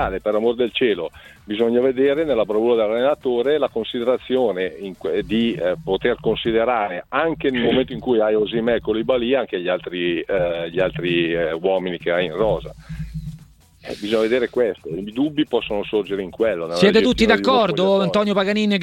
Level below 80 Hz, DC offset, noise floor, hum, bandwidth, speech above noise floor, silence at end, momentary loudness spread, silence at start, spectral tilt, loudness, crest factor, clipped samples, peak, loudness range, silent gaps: -44 dBFS; under 0.1%; -47 dBFS; none; 16 kHz; 27 dB; 0 s; 9 LU; 0 s; -6 dB/octave; -20 LUFS; 20 dB; under 0.1%; 0 dBFS; 5 LU; none